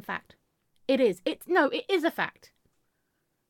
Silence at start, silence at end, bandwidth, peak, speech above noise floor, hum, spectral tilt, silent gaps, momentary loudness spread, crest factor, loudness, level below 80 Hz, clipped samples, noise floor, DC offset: 0.1 s; 1.2 s; 17.5 kHz; -12 dBFS; 50 dB; none; -4.5 dB/octave; none; 12 LU; 18 dB; -27 LUFS; -76 dBFS; under 0.1%; -77 dBFS; under 0.1%